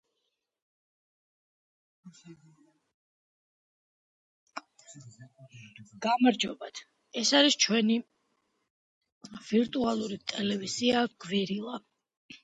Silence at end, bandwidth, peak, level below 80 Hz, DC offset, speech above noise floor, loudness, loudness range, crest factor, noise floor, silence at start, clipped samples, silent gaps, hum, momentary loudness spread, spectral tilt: 0.05 s; 9 kHz; -10 dBFS; -74 dBFS; under 0.1%; 53 dB; -28 LUFS; 6 LU; 22 dB; -82 dBFS; 2.05 s; under 0.1%; 2.94-4.47 s, 8.70-9.01 s, 9.12-9.21 s, 12.17-12.29 s; none; 23 LU; -3 dB/octave